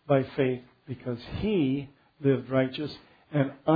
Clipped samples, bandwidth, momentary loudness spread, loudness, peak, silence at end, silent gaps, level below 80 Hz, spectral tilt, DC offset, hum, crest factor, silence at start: under 0.1%; 5 kHz; 13 LU; -29 LUFS; -10 dBFS; 0 s; none; -54 dBFS; -10 dB/octave; under 0.1%; none; 18 dB; 0.1 s